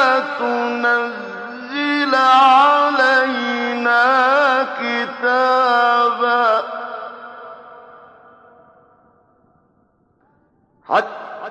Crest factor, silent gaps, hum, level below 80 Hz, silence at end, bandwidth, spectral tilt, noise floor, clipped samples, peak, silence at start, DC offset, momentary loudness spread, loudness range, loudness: 14 dB; none; none; -74 dBFS; 0 s; 9.6 kHz; -3 dB/octave; -60 dBFS; under 0.1%; -2 dBFS; 0 s; under 0.1%; 18 LU; 14 LU; -15 LUFS